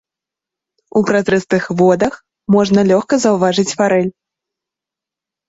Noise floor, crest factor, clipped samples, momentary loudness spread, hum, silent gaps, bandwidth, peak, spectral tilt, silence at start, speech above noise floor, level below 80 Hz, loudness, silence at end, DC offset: -86 dBFS; 14 dB; under 0.1%; 6 LU; none; none; 8 kHz; 0 dBFS; -5.5 dB/octave; 0.95 s; 73 dB; -54 dBFS; -14 LUFS; 1.4 s; under 0.1%